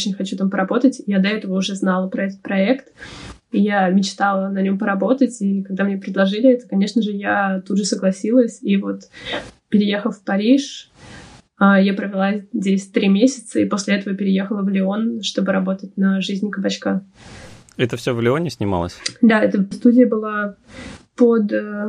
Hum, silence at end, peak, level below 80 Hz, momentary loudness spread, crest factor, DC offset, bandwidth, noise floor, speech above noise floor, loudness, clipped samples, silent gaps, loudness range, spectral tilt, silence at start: none; 0 s; -2 dBFS; -56 dBFS; 10 LU; 16 dB; under 0.1%; 10.5 kHz; -42 dBFS; 24 dB; -19 LUFS; under 0.1%; none; 3 LU; -6 dB/octave; 0 s